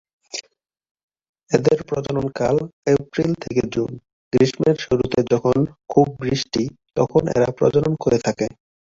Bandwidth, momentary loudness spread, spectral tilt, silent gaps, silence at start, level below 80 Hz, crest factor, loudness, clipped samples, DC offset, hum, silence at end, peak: 7.8 kHz; 8 LU; -6.5 dB/octave; 0.91-0.95 s, 1.03-1.08 s, 1.29-1.34 s, 2.73-2.83 s, 4.13-4.31 s; 0.35 s; -48 dBFS; 20 dB; -20 LUFS; under 0.1%; under 0.1%; none; 0.5 s; -2 dBFS